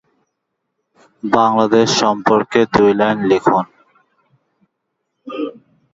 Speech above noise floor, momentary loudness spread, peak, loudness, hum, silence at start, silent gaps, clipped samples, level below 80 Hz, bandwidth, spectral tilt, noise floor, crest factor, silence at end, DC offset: 61 dB; 15 LU; 0 dBFS; -14 LUFS; none; 1.25 s; none; under 0.1%; -52 dBFS; 7.8 kHz; -4.5 dB/octave; -74 dBFS; 18 dB; 0.45 s; under 0.1%